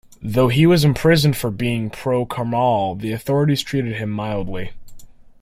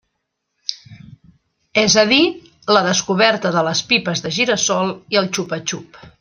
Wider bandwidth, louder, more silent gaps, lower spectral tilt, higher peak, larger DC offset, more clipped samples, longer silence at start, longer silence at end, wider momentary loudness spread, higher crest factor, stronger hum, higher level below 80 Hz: first, 16 kHz vs 10.5 kHz; second, -19 LUFS vs -16 LUFS; neither; first, -6.5 dB/octave vs -3 dB/octave; about the same, -2 dBFS vs -2 dBFS; neither; neither; second, 0.2 s vs 0.7 s; about the same, 0.2 s vs 0.1 s; second, 11 LU vs 15 LU; about the same, 16 dB vs 18 dB; neither; first, -44 dBFS vs -58 dBFS